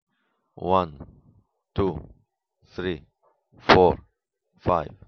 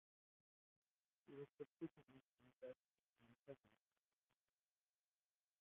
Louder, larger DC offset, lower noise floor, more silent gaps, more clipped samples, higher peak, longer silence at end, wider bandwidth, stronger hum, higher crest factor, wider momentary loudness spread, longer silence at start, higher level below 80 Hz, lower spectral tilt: first, -24 LUFS vs -61 LUFS; neither; second, -74 dBFS vs under -90 dBFS; second, none vs 1.53-1.58 s, 1.67-1.77 s, 2.21-2.35 s, 2.55-2.59 s, 2.79-2.95 s, 3.03-3.16 s, 3.39-3.44 s, 3.60-3.64 s; neither; first, 0 dBFS vs -42 dBFS; second, 0.2 s vs 1.85 s; first, 6.6 kHz vs 3.7 kHz; neither; about the same, 26 dB vs 24 dB; first, 18 LU vs 8 LU; second, 0.6 s vs 1.25 s; first, -46 dBFS vs under -90 dBFS; second, -4 dB/octave vs -6.5 dB/octave